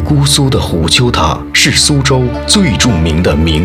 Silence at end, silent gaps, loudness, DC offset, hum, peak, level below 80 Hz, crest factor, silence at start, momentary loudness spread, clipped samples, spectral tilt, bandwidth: 0 s; none; -9 LUFS; 0.3%; none; 0 dBFS; -22 dBFS; 10 dB; 0 s; 4 LU; 0.2%; -4 dB/octave; 17 kHz